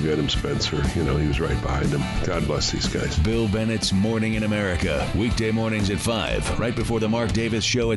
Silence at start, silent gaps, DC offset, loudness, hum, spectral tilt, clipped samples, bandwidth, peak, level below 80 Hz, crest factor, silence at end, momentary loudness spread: 0 s; none; under 0.1%; -23 LUFS; none; -5 dB/octave; under 0.1%; 11.5 kHz; -12 dBFS; -32 dBFS; 12 dB; 0 s; 2 LU